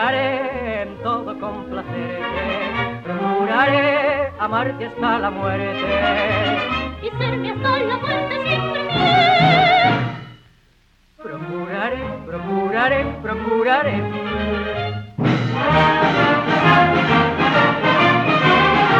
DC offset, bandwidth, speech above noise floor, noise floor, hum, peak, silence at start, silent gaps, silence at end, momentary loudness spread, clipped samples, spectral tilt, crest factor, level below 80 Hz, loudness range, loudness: under 0.1%; 8.2 kHz; 37 dB; -56 dBFS; none; -2 dBFS; 0 s; none; 0 s; 13 LU; under 0.1%; -6.5 dB/octave; 16 dB; -42 dBFS; 7 LU; -18 LUFS